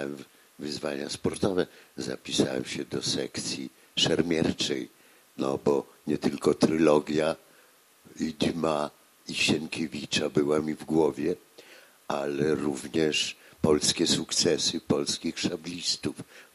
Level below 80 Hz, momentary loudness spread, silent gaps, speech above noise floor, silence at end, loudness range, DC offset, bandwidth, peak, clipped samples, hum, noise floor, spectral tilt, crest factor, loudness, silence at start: -60 dBFS; 12 LU; none; 31 dB; 0.1 s; 4 LU; under 0.1%; 14.5 kHz; -8 dBFS; under 0.1%; none; -59 dBFS; -4 dB/octave; 20 dB; -28 LUFS; 0 s